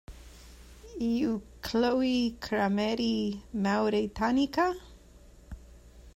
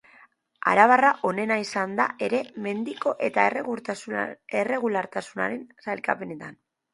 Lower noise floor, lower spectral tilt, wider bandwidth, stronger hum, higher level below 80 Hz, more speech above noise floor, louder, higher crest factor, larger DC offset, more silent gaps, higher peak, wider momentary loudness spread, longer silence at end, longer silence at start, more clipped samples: about the same, -54 dBFS vs -57 dBFS; about the same, -5.5 dB/octave vs -5 dB/octave; first, 16 kHz vs 11.5 kHz; neither; first, -52 dBFS vs -74 dBFS; second, 26 dB vs 32 dB; second, -29 LUFS vs -25 LUFS; second, 16 dB vs 24 dB; neither; neither; second, -14 dBFS vs -2 dBFS; first, 18 LU vs 13 LU; second, 0.05 s vs 0.4 s; second, 0.1 s vs 0.65 s; neither